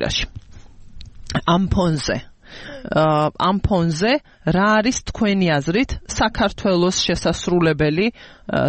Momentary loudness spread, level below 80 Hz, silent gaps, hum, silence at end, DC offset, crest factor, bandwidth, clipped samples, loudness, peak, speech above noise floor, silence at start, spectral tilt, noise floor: 8 LU; -36 dBFS; none; none; 0 s; under 0.1%; 14 dB; 8.8 kHz; under 0.1%; -19 LUFS; -4 dBFS; 21 dB; 0 s; -5 dB/octave; -40 dBFS